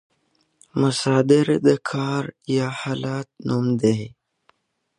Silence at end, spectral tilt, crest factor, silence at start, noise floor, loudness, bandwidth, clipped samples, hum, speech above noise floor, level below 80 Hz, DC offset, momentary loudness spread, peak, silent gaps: 0.9 s; -6.5 dB/octave; 18 dB; 0.75 s; -67 dBFS; -21 LUFS; 11.5 kHz; under 0.1%; none; 46 dB; -62 dBFS; under 0.1%; 11 LU; -4 dBFS; none